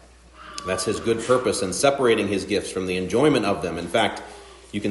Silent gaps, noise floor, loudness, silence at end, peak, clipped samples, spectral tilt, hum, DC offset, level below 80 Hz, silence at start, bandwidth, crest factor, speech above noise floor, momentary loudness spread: none; -46 dBFS; -22 LUFS; 0 s; -4 dBFS; under 0.1%; -4 dB/octave; none; under 0.1%; -52 dBFS; 0.35 s; 11.5 kHz; 20 dB; 24 dB; 13 LU